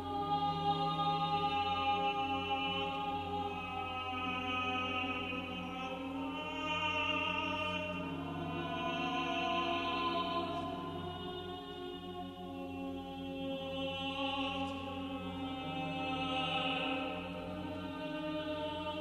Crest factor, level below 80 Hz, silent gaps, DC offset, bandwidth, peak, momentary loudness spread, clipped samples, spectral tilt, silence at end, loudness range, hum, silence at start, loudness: 16 dB; -62 dBFS; none; under 0.1%; 13.5 kHz; -22 dBFS; 9 LU; under 0.1%; -5.5 dB/octave; 0 s; 5 LU; none; 0 s; -37 LUFS